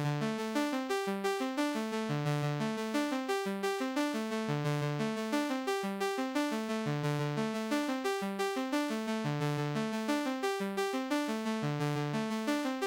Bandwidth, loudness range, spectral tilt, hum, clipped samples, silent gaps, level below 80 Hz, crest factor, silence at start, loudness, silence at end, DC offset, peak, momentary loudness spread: 17 kHz; 0 LU; -5.5 dB/octave; none; under 0.1%; none; -76 dBFS; 12 dB; 0 s; -34 LUFS; 0 s; under 0.1%; -20 dBFS; 1 LU